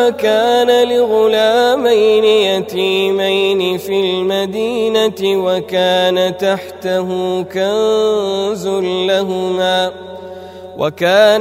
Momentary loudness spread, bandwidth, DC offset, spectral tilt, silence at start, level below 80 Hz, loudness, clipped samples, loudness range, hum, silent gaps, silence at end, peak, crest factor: 7 LU; 16 kHz; under 0.1%; -4.5 dB/octave; 0 s; -58 dBFS; -14 LUFS; under 0.1%; 4 LU; none; none; 0 s; 0 dBFS; 14 dB